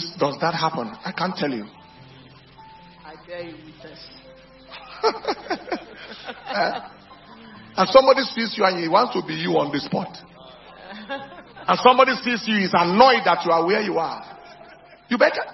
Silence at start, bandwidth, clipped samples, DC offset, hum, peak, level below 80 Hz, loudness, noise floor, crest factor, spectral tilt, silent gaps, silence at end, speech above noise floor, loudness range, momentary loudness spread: 0 s; 6 kHz; under 0.1%; under 0.1%; none; 0 dBFS; -60 dBFS; -20 LUFS; -47 dBFS; 22 dB; -5.5 dB/octave; none; 0 s; 26 dB; 14 LU; 26 LU